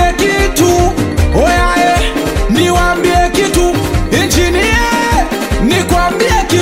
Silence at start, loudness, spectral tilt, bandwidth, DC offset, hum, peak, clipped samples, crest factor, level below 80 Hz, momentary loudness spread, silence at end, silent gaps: 0 s; -11 LUFS; -4.5 dB/octave; 16.5 kHz; 0.7%; none; 0 dBFS; under 0.1%; 10 dB; -18 dBFS; 3 LU; 0 s; none